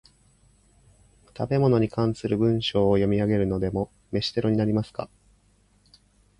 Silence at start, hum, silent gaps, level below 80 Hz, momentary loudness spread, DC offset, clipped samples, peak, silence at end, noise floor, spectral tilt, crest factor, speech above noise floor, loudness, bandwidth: 1.35 s; 50 Hz at -40 dBFS; none; -48 dBFS; 10 LU; under 0.1%; under 0.1%; -8 dBFS; 1.35 s; -62 dBFS; -7.5 dB/octave; 18 dB; 39 dB; -24 LUFS; 11 kHz